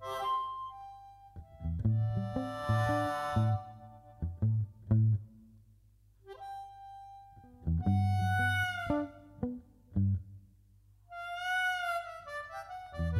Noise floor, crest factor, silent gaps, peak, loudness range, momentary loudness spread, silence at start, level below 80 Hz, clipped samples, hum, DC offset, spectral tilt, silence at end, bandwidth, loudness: -63 dBFS; 18 dB; none; -16 dBFS; 4 LU; 21 LU; 0 s; -50 dBFS; under 0.1%; 50 Hz at -55 dBFS; under 0.1%; -7 dB/octave; 0 s; 14 kHz; -34 LUFS